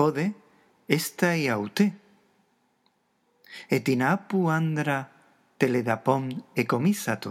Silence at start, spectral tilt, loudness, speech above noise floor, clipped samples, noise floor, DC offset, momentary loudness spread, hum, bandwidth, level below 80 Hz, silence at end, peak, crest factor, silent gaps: 0 s; -6 dB/octave; -26 LUFS; 45 dB; under 0.1%; -70 dBFS; under 0.1%; 7 LU; none; 16.5 kHz; -80 dBFS; 0 s; -6 dBFS; 20 dB; none